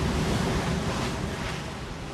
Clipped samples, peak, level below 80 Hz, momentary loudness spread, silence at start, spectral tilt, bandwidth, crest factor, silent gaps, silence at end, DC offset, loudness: under 0.1%; -14 dBFS; -36 dBFS; 8 LU; 0 s; -5 dB/octave; 14 kHz; 14 dB; none; 0 s; under 0.1%; -29 LUFS